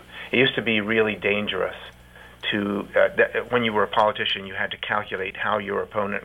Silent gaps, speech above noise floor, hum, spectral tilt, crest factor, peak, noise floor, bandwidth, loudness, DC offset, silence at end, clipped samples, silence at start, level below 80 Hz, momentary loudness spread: none; 24 dB; 60 Hz at -50 dBFS; -6 dB/octave; 18 dB; -6 dBFS; -47 dBFS; 16 kHz; -23 LUFS; under 0.1%; 0 s; under 0.1%; 0 s; -54 dBFS; 8 LU